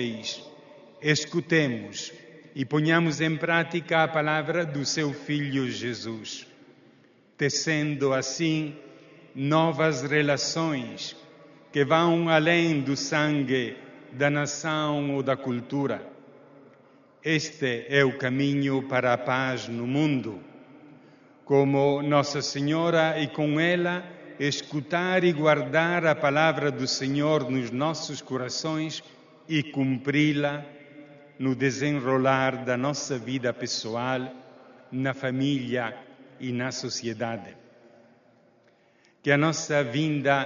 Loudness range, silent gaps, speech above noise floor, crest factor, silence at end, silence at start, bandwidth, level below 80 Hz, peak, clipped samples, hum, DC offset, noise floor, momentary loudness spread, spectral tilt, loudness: 6 LU; none; 36 dB; 20 dB; 0 s; 0 s; 7.4 kHz; -68 dBFS; -6 dBFS; under 0.1%; none; under 0.1%; -62 dBFS; 12 LU; -4.5 dB/octave; -26 LUFS